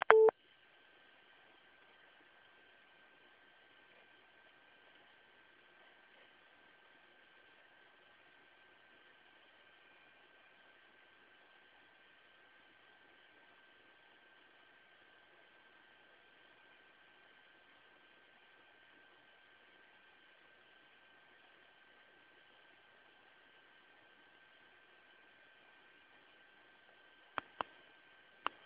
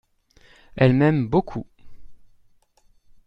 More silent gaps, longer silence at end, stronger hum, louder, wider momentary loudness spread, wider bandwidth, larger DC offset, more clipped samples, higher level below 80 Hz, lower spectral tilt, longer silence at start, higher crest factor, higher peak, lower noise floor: neither; first, 28.35 s vs 1.1 s; neither; second, -34 LUFS vs -20 LUFS; second, 1 LU vs 18 LU; second, 4 kHz vs 5.6 kHz; neither; neither; second, under -90 dBFS vs -48 dBFS; second, 0.5 dB/octave vs -9.5 dB/octave; second, 0.1 s vs 0.75 s; first, 40 dB vs 20 dB; about the same, -4 dBFS vs -4 dBFS; first, -67 dBFS vs -59 dBFS